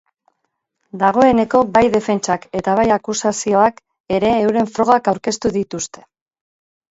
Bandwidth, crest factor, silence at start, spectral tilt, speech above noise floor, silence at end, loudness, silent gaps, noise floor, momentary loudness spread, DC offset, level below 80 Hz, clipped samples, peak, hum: 8 kHz; 16 dB; 0.95 s; -4.5 dB/octave; 57 dB; 1.05 s; -16 LUFS; 4.00-4.04 s; -73 dBFS; 9 LU; under 0.1%; -48 dBFS; under 0.1%; 0 dBFS; none